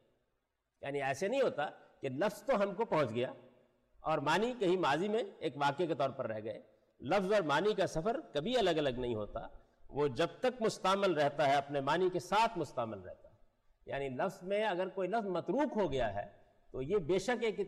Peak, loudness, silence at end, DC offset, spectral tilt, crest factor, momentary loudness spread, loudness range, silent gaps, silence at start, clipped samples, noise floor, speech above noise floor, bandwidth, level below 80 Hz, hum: -24 dBFS; -35 LUFS; 0 s; under 0.1%; -5.5 dB/octave; 12 dB; 12 LU; 3 LU; none; 0.8 s; under 0.1%; -83 dBFS; 49 dB; 13 kHz; -60 dBFS; none